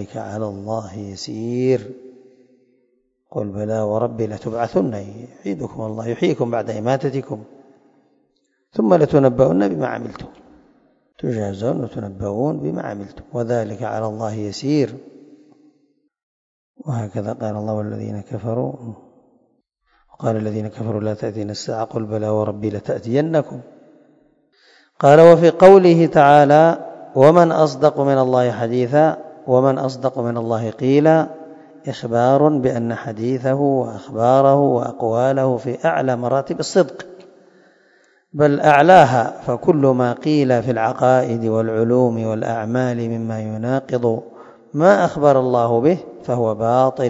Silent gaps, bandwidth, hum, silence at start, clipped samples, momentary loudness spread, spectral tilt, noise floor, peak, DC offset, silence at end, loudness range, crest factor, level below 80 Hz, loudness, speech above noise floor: 16.23-16.74 s; 8.4 kHz; none; 0 s; 0.1%; 15 LU; -7.5 dB/octave; -66 dBFS; 0 dBFS; under 0.1%; 0 s; 14 LU; 18 dB; -56 dBFS; -17 LUFS; 50 dB